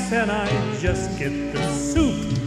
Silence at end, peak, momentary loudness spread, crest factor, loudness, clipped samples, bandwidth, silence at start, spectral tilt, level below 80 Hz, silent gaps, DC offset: 0 s; -8 dBFS; 4 LU; 14 dB; -23 LUFS; under 0.1%; 14 kHz; 0 s; -5.5 dB/octave; -36 dBFS; none; under 0.1%